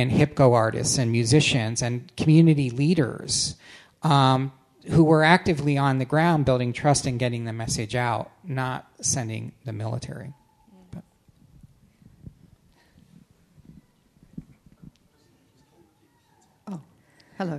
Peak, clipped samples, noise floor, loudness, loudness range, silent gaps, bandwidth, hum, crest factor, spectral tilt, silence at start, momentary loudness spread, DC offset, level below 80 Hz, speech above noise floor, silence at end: -2 dBFS; under 0.1%; -63 dBFS; -22 LUFS; 12 LU; none; 12.5 kHz; none; 24 dB; -5 dB/octave; 0 s; 20 LU; under 0.1%; -52 dBFS; 41 dB; 0 s